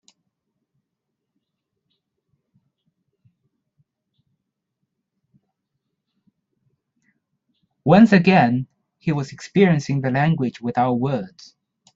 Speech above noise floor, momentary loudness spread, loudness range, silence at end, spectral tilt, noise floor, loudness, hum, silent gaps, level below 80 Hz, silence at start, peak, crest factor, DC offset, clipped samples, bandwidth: 63 dB; 15 LU; 4 LU; 0.7 s; -7.5 dB/octave; -81 dBFS; -18 LUFS; none; none; -62 dBFS; 7.85 s; -2 dBFS; 20 dB; under 0.1%; under 0.1%; 7.8 kHz